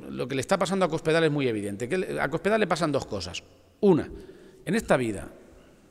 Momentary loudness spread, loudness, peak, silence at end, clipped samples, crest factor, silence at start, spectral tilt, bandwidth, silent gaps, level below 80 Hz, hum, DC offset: 15 LU; -26 LUFS; -10 dBFS; 0.5 s; under 0.1%; 18 dB; 0 s; -5.5 dB/octave; 15 kHz; none; -52 dBFS; none; under 0.1%